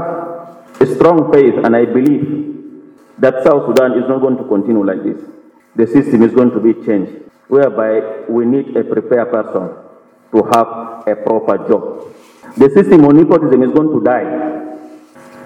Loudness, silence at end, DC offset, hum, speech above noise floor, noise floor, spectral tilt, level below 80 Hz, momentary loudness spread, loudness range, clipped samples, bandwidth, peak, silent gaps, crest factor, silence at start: -12 LUFS; 0 s; under 0.1%; none; 31 dB; -42 dBFS; -8 dB/octave; -54 dBFS; 15 LU; 5 LU; 0.3%; 13.5 kHz; 0 dBFS; none; 12 dB; 0 s